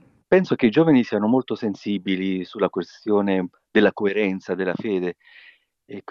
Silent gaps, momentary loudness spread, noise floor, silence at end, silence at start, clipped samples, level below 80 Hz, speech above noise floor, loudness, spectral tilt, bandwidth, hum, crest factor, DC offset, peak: none; 9 LU; -41 dBFS; 0.1 s; 0.3 s; under 0.1%; -64 dBFS; 20 dB; -22 LUFS; -7.5 dB/octave; 7 kHz; none; 16 dB; under 0.1%; -6 dBFS